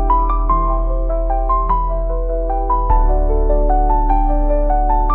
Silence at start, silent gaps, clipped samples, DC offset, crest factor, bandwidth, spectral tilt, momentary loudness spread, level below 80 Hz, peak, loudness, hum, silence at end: 0 s; none; under 0.1%; 0.4%; 12 dB; 2.5 kHz; -9.5 dB/octave; 4 LU; -16 dBFS; -2 dBFS; -18 LUFS; none; 0 s